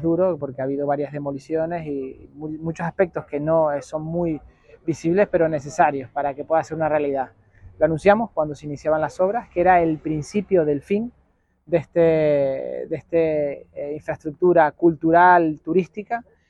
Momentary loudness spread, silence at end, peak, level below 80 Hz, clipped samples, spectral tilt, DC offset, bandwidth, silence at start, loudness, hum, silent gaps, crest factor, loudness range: 13 LU; 0.3 s; -2 dBFS; -52 dBFS; under 0.1%; -7.5 dB/octave; under 0.1%; 9.8 kHz; 0 s; -21 LUFS; none; none; 18 dB; 6 LU